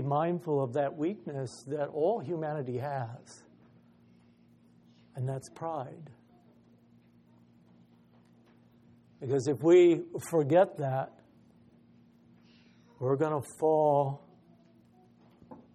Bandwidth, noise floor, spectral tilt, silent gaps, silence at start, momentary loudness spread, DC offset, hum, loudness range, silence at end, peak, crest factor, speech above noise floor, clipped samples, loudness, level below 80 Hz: 13 kHz; -62 dBFS; -7.5 dB/octave; none; 0 s; 15 LU; under 0.1%; none; 15 LU; 0.2 s; -12 dBFS; 20 dB; 32 dB; under 0.1%; -30 LUFS; -76 dBFS